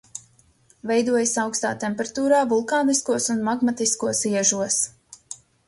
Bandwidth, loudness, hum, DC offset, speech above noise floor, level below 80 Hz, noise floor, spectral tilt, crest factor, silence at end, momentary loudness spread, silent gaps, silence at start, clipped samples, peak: 11.5 kHz; -22 LUFS; none; under 0.1%; 36 dB; -64 dBFS; -58 dBFS; -3 dB/octave; 18 dB; 0.35 s; 17 LU; none; 0.15 s; under 0.1%; -6 dBFS